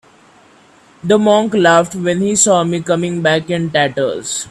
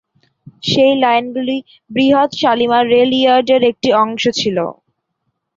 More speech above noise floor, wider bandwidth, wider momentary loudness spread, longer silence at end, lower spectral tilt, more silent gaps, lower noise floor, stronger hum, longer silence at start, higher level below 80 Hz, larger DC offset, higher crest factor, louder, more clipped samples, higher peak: second, 33 dB vs 58 dB; first, 14 kHz vs 7.6 kHz; second, 7 LU vs 10 LU; second, 0 s vs 0.85 s; about the same, -4 dB/octave vs -4.5 dB/octave; neither; second, -47 dBFS vs -71 dBFS; neither; first, 1.05 s vs 0.65 s; about the same, -54 dBFS vs -56 dBFS; neither; about the same, 14 dB vs 14 dB; about the same, -14 LUFS vs -14 LUFS; neither; about the same, 0 dBFS vs -2 dBFS